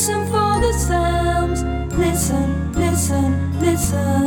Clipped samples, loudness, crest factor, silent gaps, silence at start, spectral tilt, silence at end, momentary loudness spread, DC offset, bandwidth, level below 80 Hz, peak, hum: under 0.1%; -19 LUFS; 12 dB; none; 0 s; -5.5 dB/octave; 0 s; 3 LU; under 0.1%; 19.5 kHz; -28 dBFS; -6 dBFS; none